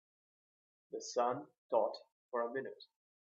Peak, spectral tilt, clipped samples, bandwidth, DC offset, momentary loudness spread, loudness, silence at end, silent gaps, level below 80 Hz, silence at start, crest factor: -20 dBFS; -3 dB/octave; under 0.1%; 7.6 kHz; under 0.1%; 15 LU; -39 LUFS; 0.5 s; 1.58-1.70 s, 2.12-2.29 s; under -90 dBFS; 0.9 s; 22 dB